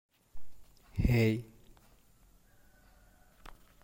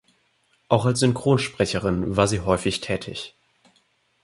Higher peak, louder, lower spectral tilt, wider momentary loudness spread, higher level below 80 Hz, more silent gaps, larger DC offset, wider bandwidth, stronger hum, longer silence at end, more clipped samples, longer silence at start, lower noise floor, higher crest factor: second, -16 dBFS vs -2 dBFS; second, -31 LUFS vs -23 LUFS; first, -7.5 dB/octave vs -5.5 dB/octave; first, 29 LU vs 9 LU; about the same, -46 dBFS vs -46 dBFS; neither; neither; first, 16.5 kHz vs 11.5 kHz; neither; second, 0.3 s vs 0.95 s; neither; second, 0.35 s vs 0.7 s; about the same, -63 dBFS vs -66 dBFS; about the same, 20 dB vs 22 dB